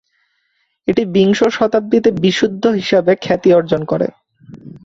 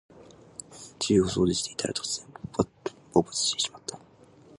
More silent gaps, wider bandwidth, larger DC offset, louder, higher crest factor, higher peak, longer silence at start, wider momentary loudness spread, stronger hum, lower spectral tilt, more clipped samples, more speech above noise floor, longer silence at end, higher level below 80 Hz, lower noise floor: neither; second, 7.8 kHz vs 11.5 kHz; neither; first, -14 LUFS vs -27 LUFS; second, 14 dB vs 24 dB; first, -2 dBFS vs -6 dBFS; first, 0.85 s vs 0.15 s; second, 6 LU vs 19 LU; neither; first, -6 dB/octave vs -4 dB/octave; neither; first, 51 dB vs 28 dB; second, 0.05 s vs 0.6 s; about the same, -52 dBFS vs -54 dBFS; first, -65 dBFS vs -55 dBFS